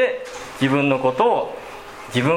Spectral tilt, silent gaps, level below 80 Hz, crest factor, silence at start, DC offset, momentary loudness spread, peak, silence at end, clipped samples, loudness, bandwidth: -6 dB/octave; none; -56 dBFS; 18 dB; 0 s; under 0.1%; 17 LU; -2 dBFS; 0 s; under 0.1%; -20 LUFS; 16 kHz